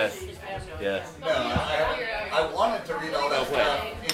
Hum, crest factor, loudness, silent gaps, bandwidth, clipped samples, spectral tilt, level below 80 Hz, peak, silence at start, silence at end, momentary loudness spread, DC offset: none; 18 dB; -27 LUFS; none; 16 kHz; under 0.1%; -4 dB/octave; -46 dBFS; -8 dBFS; 0 s; 0 s; 9 LU; under 0.1%